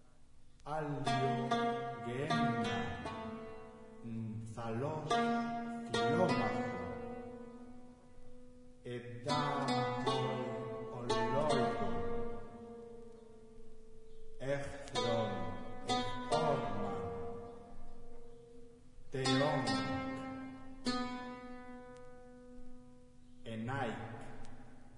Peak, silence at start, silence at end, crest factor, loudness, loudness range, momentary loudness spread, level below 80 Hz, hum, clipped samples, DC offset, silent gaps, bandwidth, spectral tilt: -20 dBFS; 0 s; 0 s; 18 dB; -38 LUFS; 8 LU; 22 LU; -54 dBFS; none; under 0.1%; under 0.1%; none; 11 kHz; -5.5 dB/octave